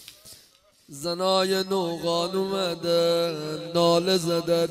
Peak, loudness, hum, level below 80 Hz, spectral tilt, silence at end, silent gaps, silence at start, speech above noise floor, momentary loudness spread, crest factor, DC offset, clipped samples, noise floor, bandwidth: -10 dBFS; -24 LUFS; none; -66 dBFS; -4.5 dB/octave; 0 s; none; 0 s; 34 dB; 10 LU; 16 dB; under 0.1%; under 0.1%; -58 dBFS; 16 kHz